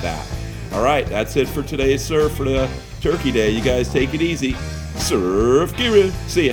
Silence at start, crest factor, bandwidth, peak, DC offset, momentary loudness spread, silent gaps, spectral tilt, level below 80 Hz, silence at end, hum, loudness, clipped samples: 0 s; 16 dB; 19.5 kHz; -2 dBFS; under 0.1%; 10 LU; none; -5 dB/octave; -30 dBFS; 0 s; none; -19 LUFS; under 0.1%